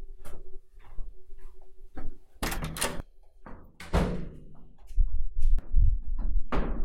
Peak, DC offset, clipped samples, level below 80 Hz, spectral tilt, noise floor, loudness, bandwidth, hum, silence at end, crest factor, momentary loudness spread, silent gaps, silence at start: -10 dBFS; under 0.1%; under 0.1%; -30 dBFS; -5 dB/octave; -47 dBFS; -33 LUFS; 16 kHz; none; 0 s; 16 dB; 24 LU; none; 0 s